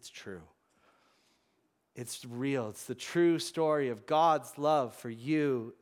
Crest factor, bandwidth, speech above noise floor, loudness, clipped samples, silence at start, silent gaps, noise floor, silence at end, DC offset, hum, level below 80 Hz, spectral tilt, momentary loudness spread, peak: 18 dB; 16.5 kHz; 45 dB; -31 LUFS; under 0.1%; 0.05 s; none; -76 dBFS; 0.1 s; under 0.1%; none; -82 dBFS; -5.5 dB/octave; 17 LU; -16 dBFS